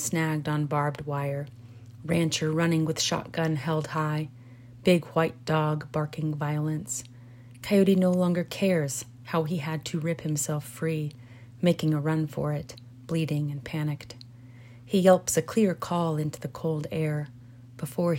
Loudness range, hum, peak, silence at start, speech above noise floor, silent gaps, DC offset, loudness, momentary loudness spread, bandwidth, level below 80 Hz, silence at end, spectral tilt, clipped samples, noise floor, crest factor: 3 LU; none; -6 dBFS; 0 s; 21 dB; none; under 0.1%; -27 LUFS; 13 LU; 16.5 kHz; -62 dBFS; 0 s; -5.5 dB/octave; under 0.1%; -48 dBFS; 20 dB